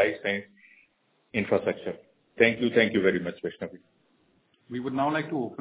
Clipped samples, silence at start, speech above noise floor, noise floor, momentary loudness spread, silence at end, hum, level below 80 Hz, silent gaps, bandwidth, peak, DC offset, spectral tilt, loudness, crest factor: under 0.1%; 0 s; 42 dB; -69 dBFS; 16 LU; 0.05 s; none; -64 dBFS; none; 4 kHz; -6 dBFS; under 0.1%; -9 dB/octave; -27 LUFS; 24 dB